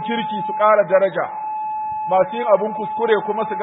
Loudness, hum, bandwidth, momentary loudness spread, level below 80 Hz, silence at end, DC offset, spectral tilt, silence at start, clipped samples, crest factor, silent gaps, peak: -19 LUFS; none; 4 kHz; 10 LU; -68 dBFS; 0 s; under 0.1%; -10 dB/octave; 0 s; under 0.1%; 16 dB; none; -2 dBFS